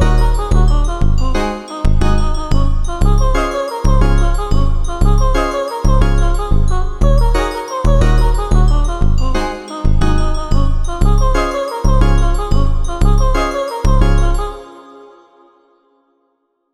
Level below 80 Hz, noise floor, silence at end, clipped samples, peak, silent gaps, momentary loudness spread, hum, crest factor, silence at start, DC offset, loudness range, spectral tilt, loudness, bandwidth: -12 dBFS; -64 dBFS; 0 s; under 0.1%; 0 dBFS; none; 5 LU; none; 12 dB; 0 s; 3%; 2 LU; -6.5 dB/octave; -16 LUFS; 12 kHz